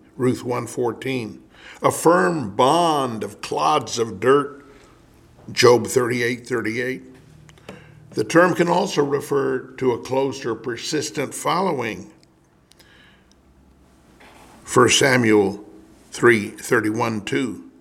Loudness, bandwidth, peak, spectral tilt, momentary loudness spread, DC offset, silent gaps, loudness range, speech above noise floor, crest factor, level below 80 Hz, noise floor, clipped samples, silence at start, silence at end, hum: -20 LUFS; 16.5 kHz; 0 dBFS; -4.5 dB/octave; 13 LU; under 0.1%; none; 8 LU; 36 dB; 20 dB; -58 dBFS; -56 dBFS; under 0.1%; 0.2 s; 0.1 s; none